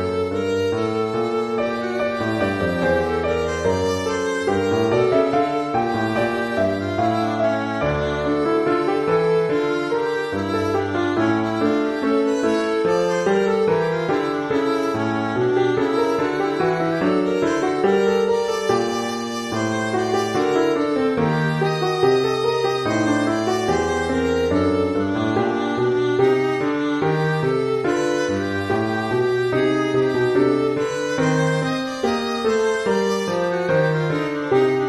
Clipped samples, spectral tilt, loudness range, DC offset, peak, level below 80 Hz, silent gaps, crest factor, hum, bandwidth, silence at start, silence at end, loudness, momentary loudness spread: under 0.1%; -6 dB/octave; 1 LU; under 0.1%; -6 dBFS; -48 dBFS; none; 14 dB; none; 13 kHz; 0 s; 0 s; -20 LUFS; 4 LU